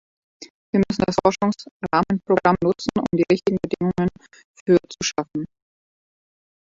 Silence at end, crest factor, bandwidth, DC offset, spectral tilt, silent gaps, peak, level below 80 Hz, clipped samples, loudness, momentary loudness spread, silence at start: 1.25 s; 20 dB; 7.8 kHz; under 0.1%; -6 dB/octave; 0.50-0.73 s, 1.71-1.80 s, 4.44-4.54 s, 4.61-4.66 s; -2 dBFS; -52 dBFS; under 0.1%; -21 LUFS; 9 LU; 0.4 s